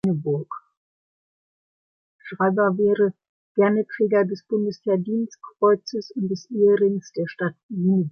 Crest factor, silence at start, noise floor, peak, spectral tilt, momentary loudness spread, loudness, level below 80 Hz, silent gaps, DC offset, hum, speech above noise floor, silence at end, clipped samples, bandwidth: 16 dB; 0.05 s; under -90 dBFS; -6 dBFS; -8 dB/octave; 9 LU; -22 LUFS; -68 dBFS; 0.77-2.19 s, 3.29-3.55 s, 7.63-7.69 s; under 0.1%; none; over 68 dB; 0 s; under 0.1%; 6.6 kHz